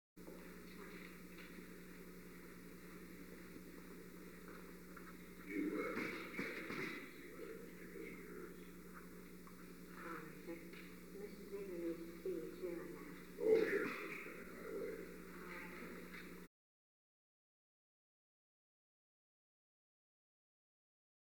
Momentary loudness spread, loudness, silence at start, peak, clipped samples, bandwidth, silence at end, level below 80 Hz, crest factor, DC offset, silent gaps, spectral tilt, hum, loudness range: 13 LU; -48 LUFS; 0.15 s; -22 dBFS; under 0.1%; 19 kHz; 4.8 s; -72 dBFS; 26 dB; under 0.1%; none; -5.5 dB/octave; none; 13 LU